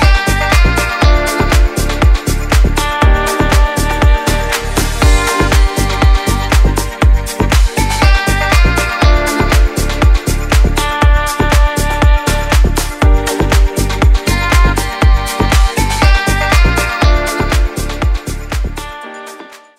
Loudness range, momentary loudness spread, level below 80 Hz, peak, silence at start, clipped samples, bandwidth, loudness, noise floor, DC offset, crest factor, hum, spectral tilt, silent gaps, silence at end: 1 LU; 5 LU; -12 dBFS; 0 dBFS; 0 s; under 0.1%; 16 kHz; -12 LUFS; -33 dBFS; under 0.1%; 10 dB; none; -4.5 dB/octave; none; 0.25 s